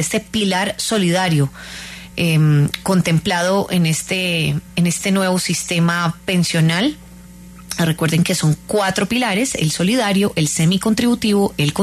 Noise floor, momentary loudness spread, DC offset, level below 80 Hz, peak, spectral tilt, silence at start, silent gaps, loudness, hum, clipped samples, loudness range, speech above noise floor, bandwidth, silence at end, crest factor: -39 dBFS; 4 LU; under 0.1%; -46 dBFS; -4 dBFS; -4.5 dB/octave; 0 s; none; -17 LUFS; none; under 0.1%; 2 LU; 22 dB; 13.5 kHz; 0 s; 14 dB